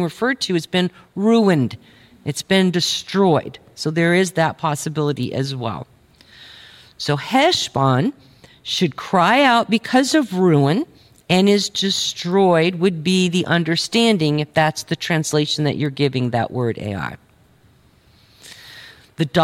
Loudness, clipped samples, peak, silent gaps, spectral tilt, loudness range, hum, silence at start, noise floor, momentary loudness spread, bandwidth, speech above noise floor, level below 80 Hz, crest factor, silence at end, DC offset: -18 LUFS; under 0.1%; -2 dBFS; none; -5 dB/octave; 6 LU; none; 0 s; -53 dBFS; 12 LU; 16 kHz; 35 dB; -58 dBFS; 16 dB; 0 s; under 0.1%